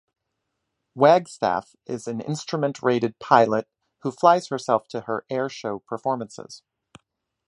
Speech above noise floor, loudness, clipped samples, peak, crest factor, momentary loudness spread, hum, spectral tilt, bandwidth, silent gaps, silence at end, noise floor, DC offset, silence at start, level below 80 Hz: 56 dB; -23 LUFS; under 0.1%; -2 dBFS; 22 dB; 15 LU; none; -5.5 dB/octave; 11 kHz; none; 0.9 s; -79 dBFS; under 0.1%; 0.95 s; -68 dBFS